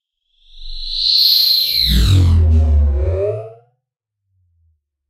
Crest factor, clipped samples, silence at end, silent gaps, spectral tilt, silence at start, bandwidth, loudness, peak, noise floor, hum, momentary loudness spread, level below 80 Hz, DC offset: 14 dB; under 0.1%; 1.55 s; none; -5 dB/octave; 0.55 s; 15.5 kHz; -13 LUFS; -2 dBFS; -77 dBFS; none; 14 LU; -20 dBFS; under 0.1%